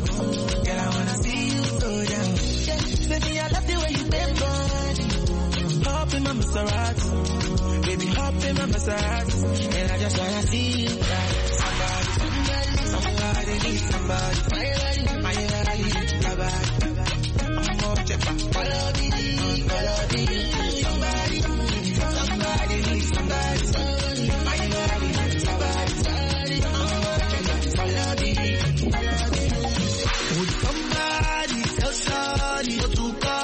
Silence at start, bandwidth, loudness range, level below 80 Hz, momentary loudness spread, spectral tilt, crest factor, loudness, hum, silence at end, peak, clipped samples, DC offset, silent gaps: 0 s; 8.8 kHz; 1 LU; -28 dBFS; 1 LU; -4.5 dB/octave; 14 dB; -24 LUFS; none; 0 s; -10 dBFS; under 0.1%; under 0.1%; none